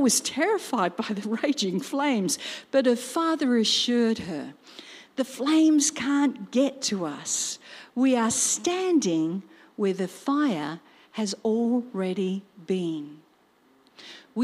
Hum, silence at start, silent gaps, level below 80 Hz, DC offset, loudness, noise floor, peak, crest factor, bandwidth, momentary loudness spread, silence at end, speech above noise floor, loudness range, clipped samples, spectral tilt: none; 0 s; none; -72 dBFS; under 0.1%; -25 LUFS; -62 dBFS; -10 dBFS; 16 dB; 15.5 kHz; 15 LU; 0 s; 36 dB; 4 LU; under 0.1%; -3.5 dB/octave